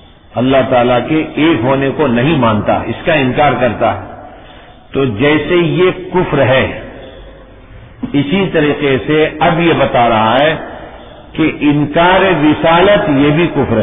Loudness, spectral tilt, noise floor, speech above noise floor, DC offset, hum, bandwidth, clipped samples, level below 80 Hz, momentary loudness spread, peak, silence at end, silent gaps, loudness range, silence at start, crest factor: -11 LUFS; -10 dB/octave; -36 dBFS; 25 dB; under 0.1%; none; 3.9 kHz; under 0.1%; -36 dBFS; 12 LU; 0 dBFS; 0 s; none; 3 LU; 0.35 s; 12 dB